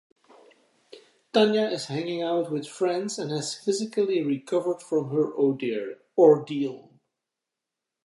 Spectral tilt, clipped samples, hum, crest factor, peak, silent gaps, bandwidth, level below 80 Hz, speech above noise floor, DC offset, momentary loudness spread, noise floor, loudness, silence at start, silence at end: -5 dB/octave; under 0.1%; none; 20 dB; -6 dBFS; none; 11.5 kHz; -82 dBFS; 62 dB; under 0.1%; 11 LU; -86 dBFS; -25 LUFS; 0.95 s; 1.25 s